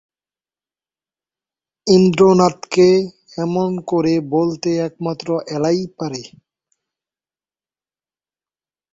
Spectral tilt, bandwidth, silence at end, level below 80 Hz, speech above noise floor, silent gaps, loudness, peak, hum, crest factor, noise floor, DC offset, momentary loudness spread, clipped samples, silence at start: -6.5 dB/octave; 7.8 kHz; 2.65 s; -58 dBFS; over 74 dB; none; -17 LUFS; -2 dBFS; none; 18 dB; under -90 dBFS; under 0.1%; 14 LU; under 0.1%; 1.85 s